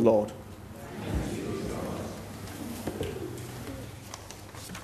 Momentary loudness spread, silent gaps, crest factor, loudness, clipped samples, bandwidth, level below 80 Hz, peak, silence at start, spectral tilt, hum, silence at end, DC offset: 10 LU; none; 24 dB; -35 LUFS; under 0.1%; 13.5 kHz; -46 dBFS; -8 dBFS; 0 s; -6 dB/octave; none; 0 s; under 0.1%